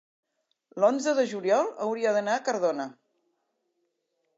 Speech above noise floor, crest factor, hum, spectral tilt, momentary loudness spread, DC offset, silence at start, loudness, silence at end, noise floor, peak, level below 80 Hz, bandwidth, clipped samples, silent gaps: 51 dB; 18 dB; none; -4 dB/octave; 8 LU; under 0.1%; 0.75 s; -26 LUFS; 1.45 s; -77 dBFS; -10 dBFS; -88 dBFS; 7.8 kHz; under 0.1%; none